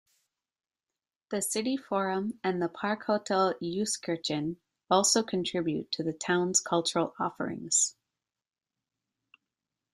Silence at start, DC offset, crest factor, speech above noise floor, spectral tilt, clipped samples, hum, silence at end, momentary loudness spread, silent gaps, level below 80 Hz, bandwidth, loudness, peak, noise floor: 1.3 s; under 0.1%; 22 dB; over 60 dB; -3 dB/octave; under 0.1%; none; 2 s; 8 LU; none; -72 dBFS; 13.5 kHz; -29 LUFS; -8 dBFS; under -90 dBFS